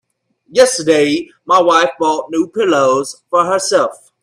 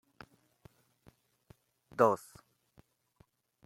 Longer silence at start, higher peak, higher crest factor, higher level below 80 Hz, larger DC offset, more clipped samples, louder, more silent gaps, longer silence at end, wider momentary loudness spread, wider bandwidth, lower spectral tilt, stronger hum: second, 0.5 s vs 2 s; first, 0 dBFS vs -12 dBFS; second, 14 dB vs 28 dB; first, -58 dBFS vs -76 dBFS; neither; neither; first, -14 LUFS vs -31 LUFS; neither; second, 0.3 s vs 1.5 s; second, 8 LU vs 28 LU; second, 13.5 kHz vs 16.5 kHz; second, -3 dB/octave vs -6.5 dB/octave; neither